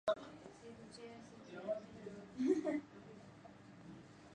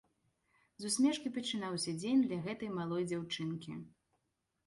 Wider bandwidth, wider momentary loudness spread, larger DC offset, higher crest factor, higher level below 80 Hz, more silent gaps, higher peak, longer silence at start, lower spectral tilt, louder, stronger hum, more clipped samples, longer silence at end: second, 10 kHz vs 11.5 kHz; first, 20 LU vs 12 LU; neither; about the same, 22 dB vs 18 dB; about the same, -78 dBFS vs -74 dBFS; neither; second, -24 dBFS vs -20 dBFS; second, 0.05 s vs 0.8 s; first, -6 dB/octave vs -4.5 dB/octave; second, -43 LUFS vs -36 LUFS; neither; neither; second, 0 s vs 0.8 s